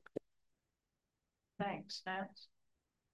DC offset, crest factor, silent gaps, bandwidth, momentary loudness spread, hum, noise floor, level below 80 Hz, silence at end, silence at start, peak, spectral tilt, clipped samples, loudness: under 0.1%; 24 dB; none; 12 kHz; 15 LU; none; -89 dBFS; -84 dBFS; 0.7 s; 0.15 s; -26 dBFS; -4.5 dB/octave; under 0.1%; -45 LUFS